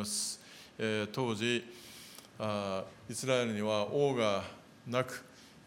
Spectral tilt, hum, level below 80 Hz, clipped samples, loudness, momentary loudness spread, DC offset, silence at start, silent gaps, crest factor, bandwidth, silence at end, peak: -4 dB/octave; none; -76 dBFS; under 0.1%; -34 LUFS; 18 LU; under 0.1%; 0 s; none; 20 dB; 17 kHz; 0.1 s; -16 dBFS